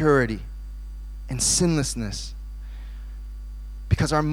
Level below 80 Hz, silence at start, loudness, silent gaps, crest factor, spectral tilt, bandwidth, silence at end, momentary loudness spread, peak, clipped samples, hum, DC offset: -34 dBFS; 0 s; -23 LUFS; none; 20 dB; -4.5 dB/octave; 16.5 kHz; 0 s; 19 LU; -6 dBFS; under 0.1%; 50 Hz at -35 dBFS; under 0.1%